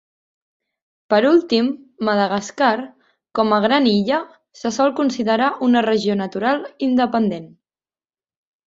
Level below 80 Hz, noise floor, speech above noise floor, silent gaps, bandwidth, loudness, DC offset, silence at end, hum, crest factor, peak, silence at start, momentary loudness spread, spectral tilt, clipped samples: -62 dBFS; under -90 dBFS; over 72 dB; none; 7.8 kHz; -18 LUFS; under 0.1%; 1.2 s; none; 16 dB; -2 dBFS; 1.1 s; 10 LU; -5.5 dB/octave; under 0.1%